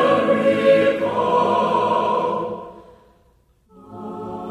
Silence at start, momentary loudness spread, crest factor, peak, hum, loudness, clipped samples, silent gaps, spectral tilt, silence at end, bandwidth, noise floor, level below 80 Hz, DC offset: 0 s; 18 LU; 16 dB; -4 dBFS; none; -18 LUFS; under 0.1%; none; -6.5 dB/octave; 0 s; 11 kHz; -58 dBFS; -58 dBFS; under 0.1%